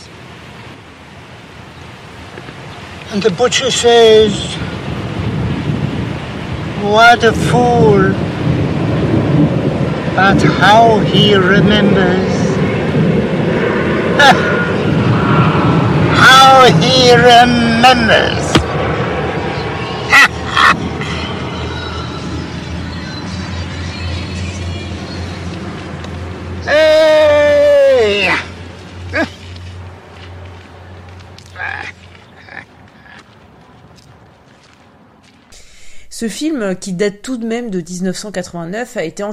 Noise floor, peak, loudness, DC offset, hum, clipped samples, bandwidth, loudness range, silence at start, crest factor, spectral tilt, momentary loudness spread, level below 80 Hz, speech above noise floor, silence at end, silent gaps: -45 dBFS; 0 dBFS; -11 LUFS; under 0.1%; none; 0.5%; 15.5 kHz; 18 LU; 0 s; 12 dB; -5 dB/octave; 22 LU; -34 dBFS; 35 dB; 0 s; none